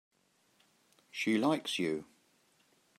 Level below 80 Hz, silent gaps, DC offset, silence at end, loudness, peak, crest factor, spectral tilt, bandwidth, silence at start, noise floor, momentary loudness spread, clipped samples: -82 dBFS; none; under 0.1%; 0.95 s; -34 LUFS; -18 dBFS; 20 dB; -4.5 dB/octave; 14.5 kHz; 1.15 s; -72 dBFS; 11 LU; under 0.1%